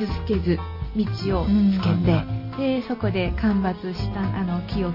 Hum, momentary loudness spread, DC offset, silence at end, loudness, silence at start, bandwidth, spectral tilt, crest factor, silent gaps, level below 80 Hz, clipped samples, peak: none; 7 LU; under 0.1%; 0 s; -24 LUFS; 0 s; 5.8 kHz; -9 dB/octave; 14 dB; none; -34 dBFS; under 0.1%; -8 dBFS